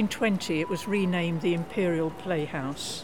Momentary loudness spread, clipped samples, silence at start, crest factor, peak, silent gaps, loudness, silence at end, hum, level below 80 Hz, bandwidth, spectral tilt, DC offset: 5 LU; under 0.1%; 0 s; 14 dB; -14 dBFS; none; -28 LUFS; 0 s; none; -58 dBFS; 17.5 kHz; -5.5 dB/octave; 0.4%